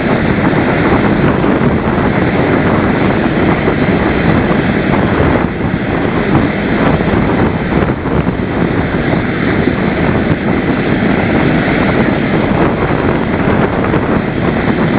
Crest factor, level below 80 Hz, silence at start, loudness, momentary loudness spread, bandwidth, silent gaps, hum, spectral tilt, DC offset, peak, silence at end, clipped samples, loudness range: 12 dB; -26 dBFS; 0 s; -12 LUFS; 3 LU; 4 kHz; none; none; -11 dB/octave; under 0.1%; 0 dBFS; 0 s; 0.1%; 2 LU